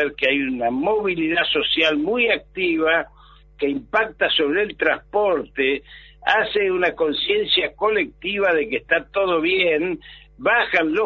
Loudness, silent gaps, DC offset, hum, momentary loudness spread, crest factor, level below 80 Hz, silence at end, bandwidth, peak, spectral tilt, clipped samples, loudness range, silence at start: -20 LUFS; none; under 0.1%; none; 5 LU; 18 dB; -50 dBFS; 0 s; 6.8 kHz; -4 dBFS; -5.5 dB/octave; under 0.1%; 1 LU; 0 s